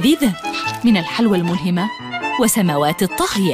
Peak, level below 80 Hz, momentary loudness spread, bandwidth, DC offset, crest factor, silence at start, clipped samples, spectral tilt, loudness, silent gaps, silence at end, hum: -4 dBFS; -48 dBFS; 6 LU; 15.5 kHz; under 0.1%; 12 dB; 0 s; under 0.1%; -4.5 dB/octave; -17 LUFS; none; 0 s; none